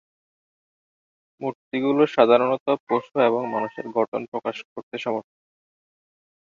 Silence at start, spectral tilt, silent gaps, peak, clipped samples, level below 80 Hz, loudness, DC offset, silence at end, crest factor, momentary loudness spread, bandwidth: 1.4 s; -7 dB/octave; 1.55-1.71 s, 2.60-2.66 s, 2.80-2.87 s, 4.08-4.12 s, 4.28-4.32 s, 4.65-4.76 s, 4.83-4.91 s; -2 dBFS; under 0.1%; -72 dBFS; -23 LUFS; under 0.1%; 1.35 s; 22 dB; 15 LU; 7.4 kHz